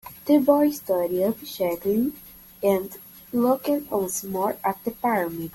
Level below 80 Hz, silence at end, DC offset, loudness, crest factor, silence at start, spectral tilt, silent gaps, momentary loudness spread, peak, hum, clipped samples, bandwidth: -60 dBFS; 0.05 s; under 0.1%; -24 LUFS; 18 dB; 0.05 s; -5.5 dB/octave; none; 8 LU; -6 dBFS; none; under 0.1%; 17 kHz